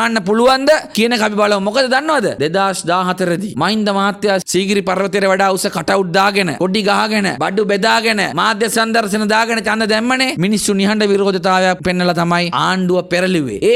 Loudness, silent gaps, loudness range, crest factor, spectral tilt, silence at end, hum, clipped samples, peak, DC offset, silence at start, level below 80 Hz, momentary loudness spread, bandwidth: -14 LUFS; none; 1 LU; 14 dB; -4 dB/octave; 0 s; none; under 0.1%; -2 dBFS; under 0.1%; 0 s; -50 dBFS; 3 LU; 16 kHz